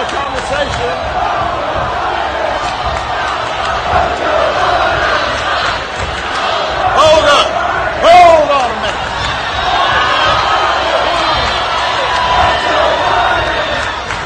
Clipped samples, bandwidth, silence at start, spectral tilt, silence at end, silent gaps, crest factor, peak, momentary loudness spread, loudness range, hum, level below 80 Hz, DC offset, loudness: under 0.1%; 9.8 kHz; 0 s; -3.5 dB/octave; 0 s; none; 12 dB; 0 dBFS; 9 LU; 5 LU; none; -30 dBFS; under 0.1%; -12 LUFS